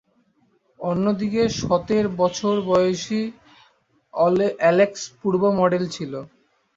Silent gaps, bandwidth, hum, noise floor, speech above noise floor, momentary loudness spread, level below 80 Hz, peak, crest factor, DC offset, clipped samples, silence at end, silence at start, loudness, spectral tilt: none; 7.8 kHz; none; -63 dBFS; 43 dB; 12 LU; -54 dBFS; -4 dBFS; 18 dB; under 0.1%; under 0.1%; 0.5 s; 0.8 s; -21 LUFS; -5.5 dB/octave